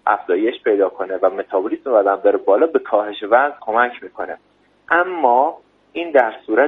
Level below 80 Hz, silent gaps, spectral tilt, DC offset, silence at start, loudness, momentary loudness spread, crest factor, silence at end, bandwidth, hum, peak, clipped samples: -68 dBFS; none; -6.5 dB/octave; under 0.1%; 0.05 s; -17 LUFS; 12 LU; 18 dB; 0 s; 4 kHz; none; 0 dBFS; under 0.1%